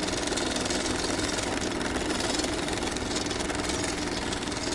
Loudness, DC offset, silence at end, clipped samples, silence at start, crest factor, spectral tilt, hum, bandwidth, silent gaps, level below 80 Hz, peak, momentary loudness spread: -28 LUFS; under 0.1%; 0 s; under 0.1%; 0 s; 16 dB; -3 dB/octave; none; 11.5 kHz; none; -44 dBFS; -12 dBFS; 2 LU